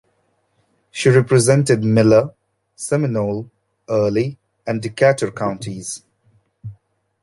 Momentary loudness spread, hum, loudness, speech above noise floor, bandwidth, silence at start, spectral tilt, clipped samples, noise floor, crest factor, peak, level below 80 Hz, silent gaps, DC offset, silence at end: 19 LU; none; -17 LUFS; 49 dB; 11.5 kHz; 0.95 s; -6 dB/octave; under 0.1%; -65 dBFS; 18 dB; 0 dBFS; -54 dBFS; none; under 0.1%; 0.5 s